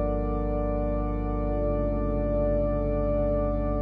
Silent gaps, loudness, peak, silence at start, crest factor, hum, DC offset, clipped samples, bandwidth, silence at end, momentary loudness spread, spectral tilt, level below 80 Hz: none; -28 LUFS; -14 dBFS; 0 s; 12 dB; 50 Hz at -35 dBFS; under 0.1%; under 0.1%; 3.1 kHz; 0 s; 3 LU; -12 dB/octave; -30 dBFS